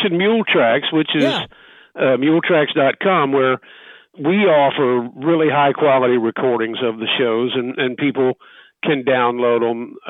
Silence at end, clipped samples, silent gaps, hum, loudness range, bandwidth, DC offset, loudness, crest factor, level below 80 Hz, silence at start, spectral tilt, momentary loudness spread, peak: 0 s; under 0.1%; none; none; 2 LU; 7.4 kHz; under 0.1%; -17 LUFS; 14 dB; -66 dBFS; 0 s; -7 dB/octave; 7 LU; -4 dBFS